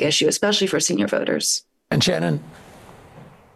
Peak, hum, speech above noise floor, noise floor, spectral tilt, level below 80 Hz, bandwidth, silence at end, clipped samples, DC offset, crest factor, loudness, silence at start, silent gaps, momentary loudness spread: -8 dBFS; none; 25 dB; -46 dBFS; -3.5 dB/octave; -56 dBFS; 15.5 kHz; 0.25 s; under 0.1%; under 0.1%; 14 dB; -20 LUFS; 0 s; none; 7 LU